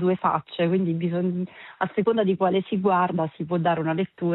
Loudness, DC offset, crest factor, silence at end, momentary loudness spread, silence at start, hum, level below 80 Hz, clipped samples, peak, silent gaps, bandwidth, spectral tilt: -24 LUFS; under 0.1%; 16 dB; 0 s; 6 LU; 0 s; none; -68 dBFS; under 0.1%; -6 dBFS; none; 4.1 kHz; -11.5 dB/octave